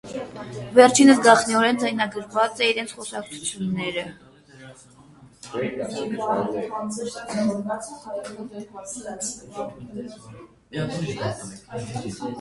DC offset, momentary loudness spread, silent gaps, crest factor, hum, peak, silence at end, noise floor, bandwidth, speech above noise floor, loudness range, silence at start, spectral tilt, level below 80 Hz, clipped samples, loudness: under 0.1%; 20 LU; none; 24 dB; none; 0 dBFS; 0 s; -50 dBFS; 11.5 kHz; 27 dB; 14 LU; 0.05 s; -4 dB/octave; -60 dBFS; under 0.1%; -22 LUFS